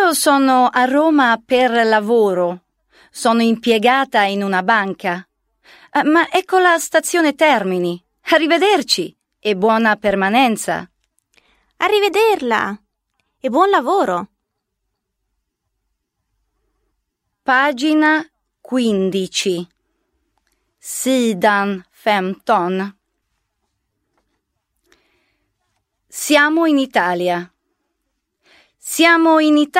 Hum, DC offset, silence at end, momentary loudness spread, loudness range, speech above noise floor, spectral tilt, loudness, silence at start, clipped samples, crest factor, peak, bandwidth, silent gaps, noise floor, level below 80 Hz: none; under 0.1%; 0 s; 12 LU; 6 LU; 60 dB; -3.5 dB/octave; -16 LUFS; 0 s; under 0.1%; 16 dB; 0 dBFS; 16 kHz; none; -75 dBFS; -62 dBFS